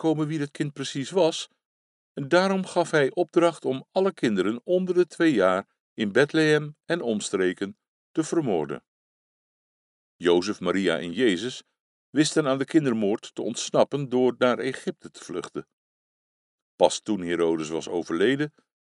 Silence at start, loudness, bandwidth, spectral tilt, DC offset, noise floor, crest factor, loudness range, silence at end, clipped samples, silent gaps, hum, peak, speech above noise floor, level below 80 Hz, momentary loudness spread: 0 s; -25 LUFS; 11.5 kHz; -5 dB/octave; under 0.1%; under -90 dBFS; 22 dB; 5 LU; 0.35 s; under 0.1%; 1.65-2.15 s, 5.80-5.96 s, 7.88-8.14 s, 8.88-10.19 s, 11.80-12.13 s, 15.73-16.78 s; none; -4 dBFS; over 66 dB; -72 dBFS; 12 LU